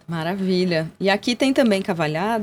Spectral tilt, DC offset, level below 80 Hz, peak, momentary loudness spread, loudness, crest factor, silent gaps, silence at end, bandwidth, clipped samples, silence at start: -5.5 dB/octave; under 0.1%; -58 dBFS; -4 dBFS; 5 LU; -21 LUFS; 16 dB; none; 0 s; 16 kHz; under 0.1%; 0.1 s